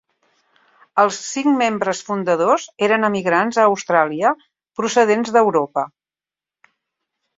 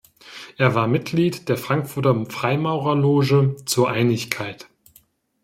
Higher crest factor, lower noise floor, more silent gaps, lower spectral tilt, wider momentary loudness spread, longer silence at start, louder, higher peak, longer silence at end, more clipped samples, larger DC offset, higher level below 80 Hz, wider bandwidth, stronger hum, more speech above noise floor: about the same, 18 dB vs 20 dB; first, under -90 dBFS vs -57 dBFS; neither; second, -4.5 dB/octave vs -6 dB/octave; second, 8 LU vs 12 LU; first, 0.95 s vs 0.25 s; about the same, -18 LUFS vs -20 LUFS; about the same, 0 dBFS vs -2 dBFS; first, 1.5 s vs 0.9 s; neither; neither; second, -66 dBFS vs -60 dBFS; second, 8 kHz vs 16.5 kHz; neither; first, over 73 dB vs 37 dB